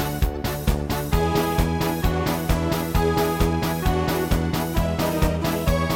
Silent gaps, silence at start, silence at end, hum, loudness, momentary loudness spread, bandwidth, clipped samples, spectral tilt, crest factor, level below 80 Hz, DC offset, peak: none; 0 s; 0 s; none; -23 LUFS; 3 LU; 17 kHz; under 0.1%; -6 dB/octave; 16 dB; -28 dBFS; under 0.1%; -6 dBFS